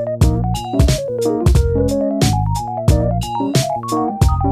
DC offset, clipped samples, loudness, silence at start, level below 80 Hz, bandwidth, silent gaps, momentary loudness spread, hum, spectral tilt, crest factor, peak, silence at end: under 0.1%; under 0.1%; -17 LUFS; 0 s; -22 dBFS; 15.5 kHz; none; 5 LU; none; -6.5 dB/octave; 16 dB; 0 dBFS; 0 s